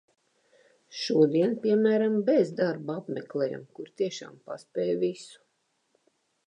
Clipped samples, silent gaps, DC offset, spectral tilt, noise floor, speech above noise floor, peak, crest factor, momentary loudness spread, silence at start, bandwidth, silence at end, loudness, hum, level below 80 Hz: under 0.1%; none; under 0.1%; -6.5 dB/octave; -74 dBFS; 48 dB; -10 dBFS; 18 dB; 19 LU; 0.9 s; 10 kHz; 1.15 s; -27 LUFS; none; -84 dBFS